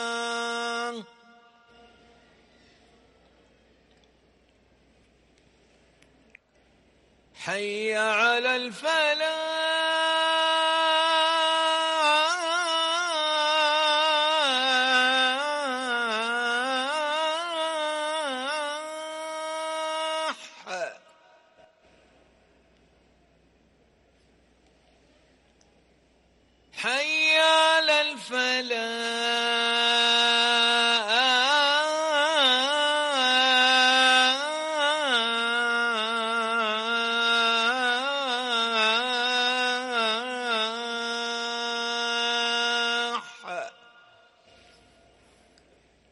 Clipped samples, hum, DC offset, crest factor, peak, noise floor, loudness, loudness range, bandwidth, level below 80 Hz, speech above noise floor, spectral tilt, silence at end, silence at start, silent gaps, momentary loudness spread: under 0.1%; none; under 0.1%; 16 dB; -10 dBFS; -63 dBFS; -23 LUFS; 13 LU; 11.5 kHz; -74 dBFS; 37 dB; 0 dB/octave; 2.4 s; 0 s; none; 11 LU